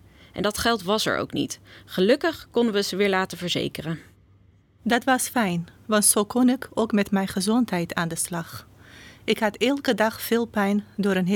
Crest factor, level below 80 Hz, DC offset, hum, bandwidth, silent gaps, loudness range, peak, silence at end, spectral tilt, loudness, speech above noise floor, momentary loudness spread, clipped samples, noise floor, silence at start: 18 dB; -56 dBFS; under 0.1%; none; 19 kHz; none; 3 LU; -6 dBFS; 0 s; -4 dB/octave; -24 LUFS; 33 dB; 12 LU; under 0.1%; -57 dBFS; 0.35 s